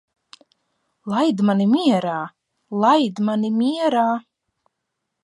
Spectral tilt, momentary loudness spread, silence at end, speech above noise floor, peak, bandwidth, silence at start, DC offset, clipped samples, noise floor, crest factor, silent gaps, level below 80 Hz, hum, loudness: -6.5 dB/octave; 12 LU; 1.05 s; 60 dB; -4 dBFS; 11.5 kHz; 1.05 s; under 0.1%; under 0.1%; -78 dBFS; 16 dB; none; -74 dBFS; none; -20 LUFS